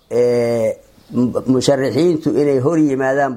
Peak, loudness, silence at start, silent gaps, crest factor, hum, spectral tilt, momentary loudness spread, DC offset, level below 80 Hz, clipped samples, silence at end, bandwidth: 0 dBFS; -16 LUFS; 0.1 s; none; 14 dB; none; -6.5 dB/octave; 5 LU; under 0.1%; -54 dBFS; under 0.1%; 0 s; 15.5 kHz